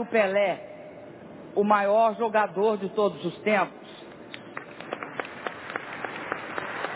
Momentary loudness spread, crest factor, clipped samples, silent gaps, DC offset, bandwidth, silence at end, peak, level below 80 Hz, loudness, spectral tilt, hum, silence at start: 21 LU; 20 dB; under 0.1%; none; under 0.1%; 4 kHz; 0 s; -8 dBFS; -72 dBFS; -27 LUFS; -9 dB/octave; none; 0 s